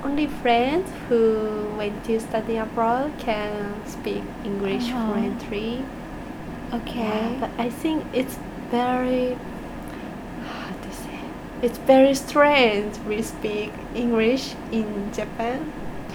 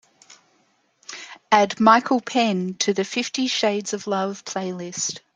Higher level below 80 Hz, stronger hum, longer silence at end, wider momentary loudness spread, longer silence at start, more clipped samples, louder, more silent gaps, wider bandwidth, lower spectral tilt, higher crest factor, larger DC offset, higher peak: first, -44 dBFS vs -70 dBFS; neither; second, 0 s vs 0.15 s; first, 16 LU vs 13 LU; second, 0 s vs 0.3 s; neither; second, -24 LUFS vs -21 LUFS; neither; first, over 20 kHz vs 9.8 kHz; first, -5 dB/octave vs -3.5 dB/octave; about the same, 20 dB vs 22 dB; neither; about the same, -4 dBFS vs -2 dBFS